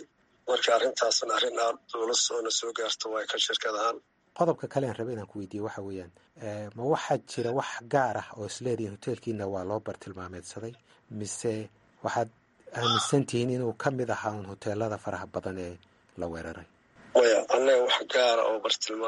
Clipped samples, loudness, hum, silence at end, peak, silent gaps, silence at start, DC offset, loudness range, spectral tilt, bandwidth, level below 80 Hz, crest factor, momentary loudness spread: under 0.1%; -29 LUFS; none; 0 s; -10 dBFS; none; 0 s; under 0.1%; 8 LU; -3.5 dB/octave; 11.5 kHz; -66 dBFS; 20 dB; 16 LU